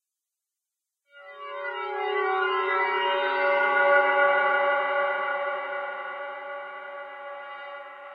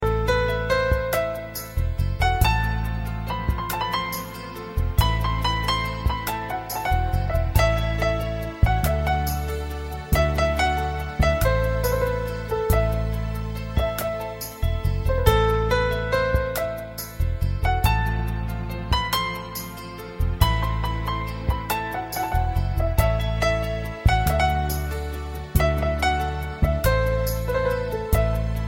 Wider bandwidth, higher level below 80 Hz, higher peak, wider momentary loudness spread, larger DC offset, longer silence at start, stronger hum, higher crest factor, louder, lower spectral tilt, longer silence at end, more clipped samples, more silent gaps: second, 5.6 kHz vs 17 kHz; second, under -90 dBFS vs -28 dBFS; second, -10 dBFS vs -4 dBFS; first, 18 LU vs 8 LU; neither; first, 1.15 s vs 0 s; neither; about the same, 18 dB vs 20 dB; about the same, -25 LUFS vs -24 LUFS; second, -4 dB/octave vs -5.5 dB/octave; about the same, 0 s vs 0 s; neither; neither